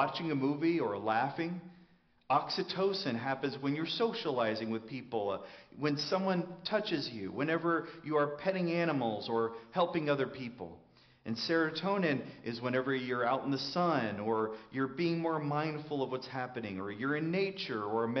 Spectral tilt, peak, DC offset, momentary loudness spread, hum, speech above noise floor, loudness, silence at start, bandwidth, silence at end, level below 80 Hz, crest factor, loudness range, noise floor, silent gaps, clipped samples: -4 dB/octave; -16 dBFS; under 0.1%; 8 LU; none; 31 dB; -34 LUFS; 0 s; 6.4 kHz; 0 s; -76 dBFS; 18 dB; 2 LU; -65 dBFS; none; under 0.1%